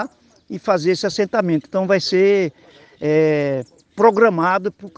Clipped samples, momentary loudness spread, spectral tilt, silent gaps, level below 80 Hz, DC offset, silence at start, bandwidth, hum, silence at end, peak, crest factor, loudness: under 0.1%; 12 LU; -6 dB/octave; none; -64 dBFS; under 0.1%; 0 s; 9 kHz; none; 0.1 s; 0 dBFS; 18 dB; -18 LUFS